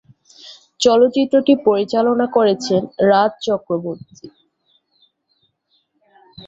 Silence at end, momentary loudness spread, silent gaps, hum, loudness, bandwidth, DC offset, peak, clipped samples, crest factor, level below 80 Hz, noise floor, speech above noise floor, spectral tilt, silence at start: 0 s; 9 LU; none; none; -16 LUFS; 8 kHz; under 0.1%; -2 dBFS; under 0.1%; 16 dB; -62 dBFS; -66 dBFS; 50 dB; -5 dB/octave; 0.45 s